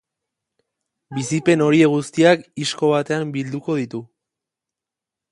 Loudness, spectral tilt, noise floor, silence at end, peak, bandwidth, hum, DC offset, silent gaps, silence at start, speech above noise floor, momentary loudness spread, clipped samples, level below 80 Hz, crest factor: -19 LUFS; -5.5 dB/octave; -87 dBFS; 1.25 s; 0 dBFS; 11.5 kHz; none; under 0.1%; none; 1.1 s; 69 dB; 13 LU; under 0.1%; -64 dBFS; 20 dB